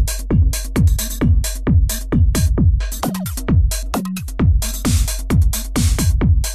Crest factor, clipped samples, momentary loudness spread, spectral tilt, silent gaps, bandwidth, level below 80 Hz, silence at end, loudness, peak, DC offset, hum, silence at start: 10 dB; under 0.1%; 6 LU; -5.5 dB/octave; none; 14 kHz; -18 dBFS; 0 s; -18 LUFS; -6 dBFS; under 0.1%; none; 0 s